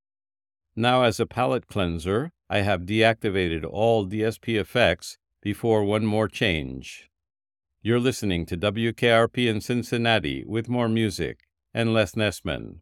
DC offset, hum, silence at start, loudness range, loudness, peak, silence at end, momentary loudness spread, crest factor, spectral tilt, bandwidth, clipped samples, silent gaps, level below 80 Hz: under 0.1%; none; 0.75 s; 2 LU; -24 LUFS; -4 dBFS; 0 s; 11 LU; 20 dB; -5.5 dB/octave; 16 kHz; under 0.1%; none; -52 dBFS